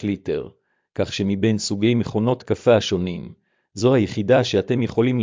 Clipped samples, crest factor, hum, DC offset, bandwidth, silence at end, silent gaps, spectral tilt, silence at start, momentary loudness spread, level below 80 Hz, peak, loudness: under 0.1%; 16 dB; none; under 0.1%; 7.6 kHz; 0 s; none; -6 dB/octave; 0 s; 13 LU; -48 dBFS; -4 dBFS; -21 LUFS